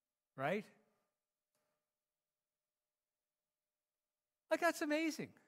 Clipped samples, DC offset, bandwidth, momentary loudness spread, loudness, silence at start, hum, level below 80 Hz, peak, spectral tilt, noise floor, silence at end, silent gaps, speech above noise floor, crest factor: under 0.1%; under 0.1%; 16 kHz; 7 LU; -39 LUFS; 0.35 s; none; under -90 dBFS; -22 dBFS; -4.5 dB/octave; under -90 dBFS; 0.2 s; none; over 51 dB; 24 dB